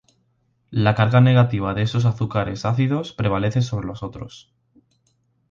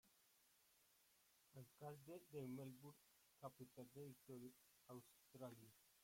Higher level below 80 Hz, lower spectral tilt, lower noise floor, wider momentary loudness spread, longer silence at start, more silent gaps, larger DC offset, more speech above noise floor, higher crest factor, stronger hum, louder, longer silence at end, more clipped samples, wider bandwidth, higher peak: first, -46 dBFS vs under -90 dBFS; first, -7.5 dB/octave vs -6 dB/octave; second, -66 dBFS vs -79 dBFS; first, 16 LU vs 11 LU; first, 0.7 s vs 0.05 s; neither; neither; first, 47 dB vs 19 dB; about the same, 18 dB vs 18 dB; neither; first, -20 LUFS vs -61 LUFS; first, 1.1 s vs 0 s; neither; second, 7.2 kHz vs 16.5 kHz; first, -2 dBFS vs -42 dBFS